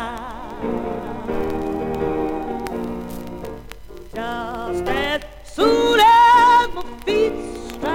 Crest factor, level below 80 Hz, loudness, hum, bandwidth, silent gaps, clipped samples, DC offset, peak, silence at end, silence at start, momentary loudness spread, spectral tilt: 16 dB; -40 dBFS; -19 LUFS; none; 17 kHz; none; under 0.1%; under 0.1%; -4 dBFS; 0 s; 0 s; 21 LU; -4.5 dB/octave